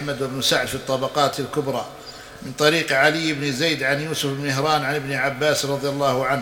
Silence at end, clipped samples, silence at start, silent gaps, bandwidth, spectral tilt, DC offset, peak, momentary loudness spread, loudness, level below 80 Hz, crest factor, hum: 0 s; under 0.1%; 0 s; none; over 20 kHz; -3.5 dB/octave; under 0.1%; 0 dBFS; 10 LU; -21 LUFS; -54 dBFS; 22 dB; none